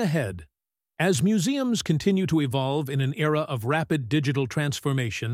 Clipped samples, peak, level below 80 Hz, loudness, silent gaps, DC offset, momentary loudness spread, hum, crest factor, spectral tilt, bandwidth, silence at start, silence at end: under 0.1%; -8 dBFS; -56 dBFS; -25 LUFS; none; under 0.1%; 4 LU; none; 16 dB; -5.5 dB/octave; 16 kHz; 0 s; 0 s